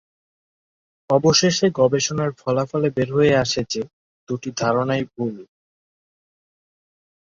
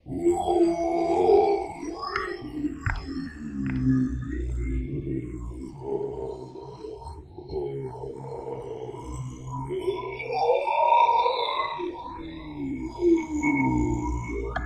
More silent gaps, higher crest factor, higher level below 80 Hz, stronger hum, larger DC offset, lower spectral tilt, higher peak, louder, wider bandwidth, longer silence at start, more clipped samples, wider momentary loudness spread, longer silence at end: first, 3.93-4.27 s vs none; about the same, 20 dB vs 18 dB; second, -54 dBFS vs -40 dBFS; neither; neither; second, -4.5 dB/octave vs -7 dB/octave; first, -2 dBFS vs -8 dBFS; first, -20 LUFS vs -27 LUFS; second, 7.6 kHz vs 10 kHz; first, 1.1 s vs 0.05 s; neither; second, 13 LU vs 16 LU; first, 1.95 s vs 0 s